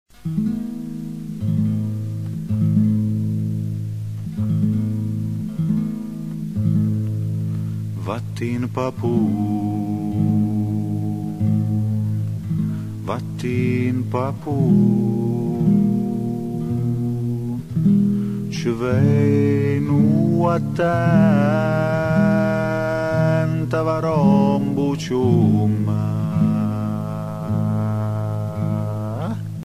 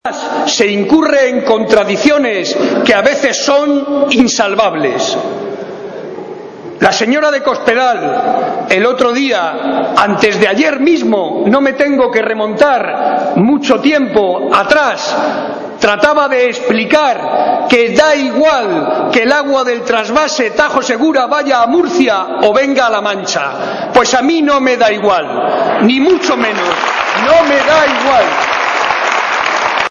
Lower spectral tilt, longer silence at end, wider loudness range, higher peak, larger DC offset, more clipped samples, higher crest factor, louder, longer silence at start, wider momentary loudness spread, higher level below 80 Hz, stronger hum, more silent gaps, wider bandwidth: first, -9 dB/octave vs -3.5 dB/octave; about the same, 0.05 s vs 0 s; first, 5 LU vs 2 LU; second, -4 dBFS vs 0 dBFS; first, 0.4% vs under 0.1%; second, under 0.1% vs 0.4%; about the same, 16 dB vs 12 dB; second, -21 LUFS vs -11 LUFS; first, 0.25 s vs 0.05 s; first, 10 LU vs 6 LU; about the same, -48 dBFS vs -48 dBFS; neither; neither; first, 13.5 kHz vs 11 kHz